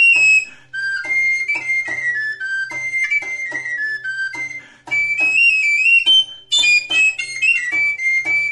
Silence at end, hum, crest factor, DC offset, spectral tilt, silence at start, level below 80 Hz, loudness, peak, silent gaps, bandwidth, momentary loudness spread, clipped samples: 0 s; none; 12 dB; under 0.1%; 1.5 dB/octave; 0 s; -64 dBFS; -15 LUFS; -6 dBFS; none; 11.5 kHz; 12 LU; under 0.1%